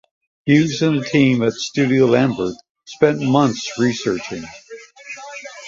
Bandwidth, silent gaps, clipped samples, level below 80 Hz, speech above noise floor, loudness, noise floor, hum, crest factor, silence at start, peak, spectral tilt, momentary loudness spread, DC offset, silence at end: 7.8 kHz; 2.70-2.75 s; under 0.1%; -56 dBFS; 20 dB; -17 LUFS; -36 dBFS; none; 16 dB; 0.45 s; -2 dBFS; -6 dB/octave; 19 LU; under 0.1%; 0 s